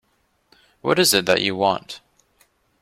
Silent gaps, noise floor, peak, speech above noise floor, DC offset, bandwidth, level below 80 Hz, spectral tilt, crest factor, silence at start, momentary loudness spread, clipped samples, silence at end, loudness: none; -66 dBFS; -2 dBFS; 47 dB; under 0.1%; 16.5 kHz; -60 dBFS; -2.5 dB/octave; 20 dB; 0.85 s; 18 LU; under 0.1%; 0.85 s; -19 LUFS